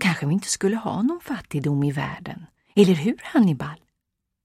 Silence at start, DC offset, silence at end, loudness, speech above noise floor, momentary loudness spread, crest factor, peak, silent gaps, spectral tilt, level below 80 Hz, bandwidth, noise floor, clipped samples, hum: 0 s; under 0.1%; 0.7 s; -23 LUFS; 58 dB; 14 LU; 20 dB; -2 dBFS; none; -5.5 dB/octave; -58 dBFS; 14.5 kHz; -80 dBFS; under 0.1%; none